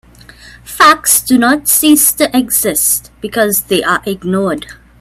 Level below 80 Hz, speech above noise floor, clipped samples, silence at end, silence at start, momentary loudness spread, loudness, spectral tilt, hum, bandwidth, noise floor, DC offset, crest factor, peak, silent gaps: -44 dBFS; 26 dB; under 0.1%; 0.25 s; 0.45 s; 9 LU; -10 LUFS; -2.5 dB/octave; none; over 20 kHz; -38 dBFS; under 0.1%; 12 dB; 0 dBFS; none